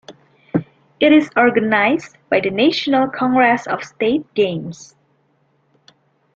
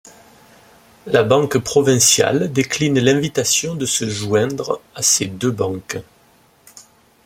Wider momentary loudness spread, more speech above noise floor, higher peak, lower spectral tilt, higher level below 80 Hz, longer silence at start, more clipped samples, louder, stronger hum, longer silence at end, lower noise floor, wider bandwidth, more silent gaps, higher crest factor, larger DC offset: about the same, 11 LU vs 11 LU; first, 45 dB vs 36 dB; about the same, -2 dBFS vs 0 dBFS; first, -5.5 dB/octave vs -3.5 dB/octave; about the same, -58 dBFS vs -54 dBFS; second, 0.1 s vs 1.05 s; neither; about the same, -17 LUFS vs -17 LUFS; neither; first, 1.5 s vs 0.45 s; first, -61 dBFS vs -53 dBFS; second, 7.6 kHz vs 16.5 kHz; neither; about the same, 16 dB vs 18 dB; neither